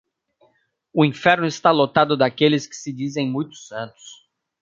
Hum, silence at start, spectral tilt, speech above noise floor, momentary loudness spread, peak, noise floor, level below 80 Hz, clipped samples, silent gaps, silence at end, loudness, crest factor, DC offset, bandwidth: none; 0.95 s; -5.5 dB/octave; 44 dB; 15 LU; -2 dBFS; -64 dBFS; -64 dBFS; under 0.1%; none; 0.5 s; -19 LUFS; 20 dB; under 0.1%; 7.6 kHz